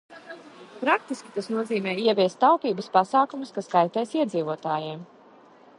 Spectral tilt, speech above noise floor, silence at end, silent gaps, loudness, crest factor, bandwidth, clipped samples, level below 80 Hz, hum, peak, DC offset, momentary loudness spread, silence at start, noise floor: -5.5 dB/octave; 28 dB; 0.75 s; none; -25 LUFS; 22 dB; 11.5 kHz; under 0.1%; -78 dBFS; none; -4 dBFS; under 0.1%; 16 LU; 0.1 s; -52 dBFS